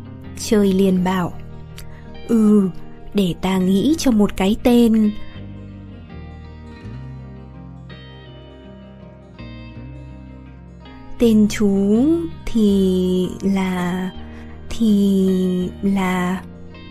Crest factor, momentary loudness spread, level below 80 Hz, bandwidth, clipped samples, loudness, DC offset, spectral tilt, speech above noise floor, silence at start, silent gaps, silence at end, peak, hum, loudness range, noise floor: 18 dB; 23 LU; -38 dBFS; 15 kHz; under 0.1%; -18 LUFS; under 0.1%; -6.5 dB/octave; 24 dB; 0 s; none; 0 s; -2 dBFS; none; 20 LU; -40 dBFS